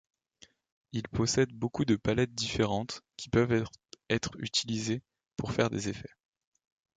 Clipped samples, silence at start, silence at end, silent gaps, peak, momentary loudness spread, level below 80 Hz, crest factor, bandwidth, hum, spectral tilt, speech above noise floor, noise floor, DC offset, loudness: under 0.1%; 0.95 s; 0.9 s; none; -12 dBFS; 12 LU; -54 dBFS; 20 dB; 9.4 kHz; none; -5 dB/octave; 31 dB; -62 dBFS; under 0.1%; -31 LUFS